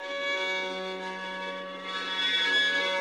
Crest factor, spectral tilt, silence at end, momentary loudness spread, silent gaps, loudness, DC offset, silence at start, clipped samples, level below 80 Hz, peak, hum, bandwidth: 16 dB; -1.5 dB/octave; 0 s; 12 LU; none; -28 LUFS; under 0.1%; 0 s; under 0.1%; -82 dBFS; -14 dBFS; none; 13.5 kHz